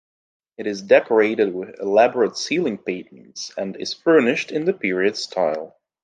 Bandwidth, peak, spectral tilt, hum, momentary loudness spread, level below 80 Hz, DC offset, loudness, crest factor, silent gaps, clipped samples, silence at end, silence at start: 9.4 kHz; -2 dBFS; -4.5 dB/octave; none; 14 LU; -70 dBFS; under 0.1%; -20 LUFS; 20 dB; none; under 0.1%; 0.35 s; 0.6 s